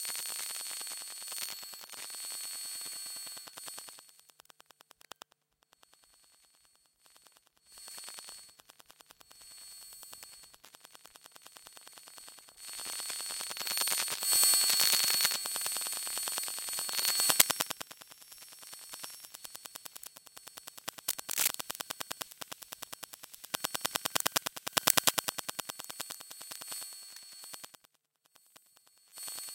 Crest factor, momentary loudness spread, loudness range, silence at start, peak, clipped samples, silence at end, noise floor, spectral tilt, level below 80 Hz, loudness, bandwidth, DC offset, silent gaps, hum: 38 dB; 25 LU; 23 LU; 0 s; 0 dBFS; under 0.1%; 0 s; -74 dBFS; 1 dB/octave; -80 dBFS; -32 LUFS; 17 kHz; under 0.1%; none; none